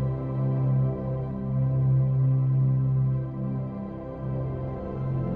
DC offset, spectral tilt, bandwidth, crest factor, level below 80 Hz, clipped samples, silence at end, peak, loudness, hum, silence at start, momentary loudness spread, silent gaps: under 0.1%; -13 dB/octave; 2.5 kHz; 10 dB; -44 dBFS; under 0.1%; 0 s; -16 dBFS; -27 LUFS; none; 0 s; 10 LU; none